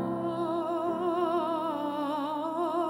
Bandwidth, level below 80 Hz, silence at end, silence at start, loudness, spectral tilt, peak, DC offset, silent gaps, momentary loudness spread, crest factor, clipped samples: 16.5 kHz; -70 dBFS; 0 s; 0 s; -31 LUFS; -7 dB/octave; -16 dBFS; under 0.1%; none; 3 LU; 14 dB; under 0.1%